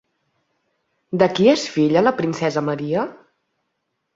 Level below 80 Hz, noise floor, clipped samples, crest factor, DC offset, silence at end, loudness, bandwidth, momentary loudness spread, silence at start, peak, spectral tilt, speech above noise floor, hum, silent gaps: -62 dBFS; -75 dBFS; under 0.1%; 20 dB; under 0.1%; 1 s; -19 LUFS; 7.8 kHz; 9 LU; 1.1 s; -2 dBFS; -6 dB/octave; 57 dB; none; none